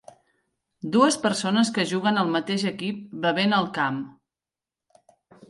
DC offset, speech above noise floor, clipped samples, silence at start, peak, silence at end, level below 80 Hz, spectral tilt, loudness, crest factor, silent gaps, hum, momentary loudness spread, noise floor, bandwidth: under 0.1%; over 67 dB; under 0.1%; 0.85 s; -6 dBFS; 1.4 s; -70 dBFS; -4.5 dB/octave; -24 LUFS; 20 dB; none; none; 11 LU; under -90 dBFS; 11.5 kHz